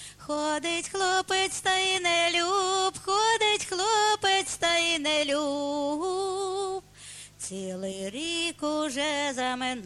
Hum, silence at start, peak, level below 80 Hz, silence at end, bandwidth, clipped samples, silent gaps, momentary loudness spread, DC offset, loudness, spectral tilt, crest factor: 50 Hz at -70 dBFS; 0 s; -12 dBFS; -62 dBFS; 0 s; 13 kHz; under 0.1%; none; 11 LU; under 0.1%; -26 LUFS; -1.5 dB/octave; 14 dB